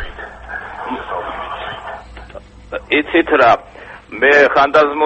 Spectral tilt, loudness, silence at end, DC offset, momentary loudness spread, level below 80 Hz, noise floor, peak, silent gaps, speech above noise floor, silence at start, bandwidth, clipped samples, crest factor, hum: -5 dB/octave; -14 LUFS; 0 s; under 0.1%; 22 LU; -40 dBFS; -36 dBFS; 0 dBFS; none; 24 dB; 0 s; 8.4 kHz; under 0.1%; 16 dB; none